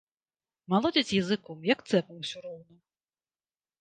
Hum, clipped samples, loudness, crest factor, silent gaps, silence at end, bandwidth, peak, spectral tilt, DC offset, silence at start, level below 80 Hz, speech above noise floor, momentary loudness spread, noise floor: none; under 0.1%; -29 LUFS; 20 dB; none; 1.2 s; 9.4 kHz; -10 dBFS; -5 dB/octave; under 0.1%; 0.7 s; -68 dBFS; over 61 dB; 16 LU; under -90 dBFS